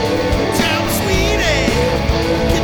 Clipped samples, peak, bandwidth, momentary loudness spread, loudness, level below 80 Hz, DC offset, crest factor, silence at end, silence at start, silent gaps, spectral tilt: under 0.1%; -2 dBFS; over 20 kHz; 2 LU; -15 LUFS; -24 dBFS; under 0.1%; 14 dB; 0 s; 0 s; none; -4.5 dB/octave